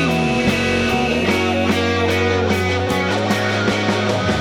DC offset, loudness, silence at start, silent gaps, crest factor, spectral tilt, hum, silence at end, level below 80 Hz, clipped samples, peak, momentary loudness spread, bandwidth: under 0.1%; -17 LUFS; 0 s; none; 14 dB; -5 dB/octave; none; 0 s; -40 dBFS; under 0.1%; -4 dBFS; 1 LU; 17.5 kHz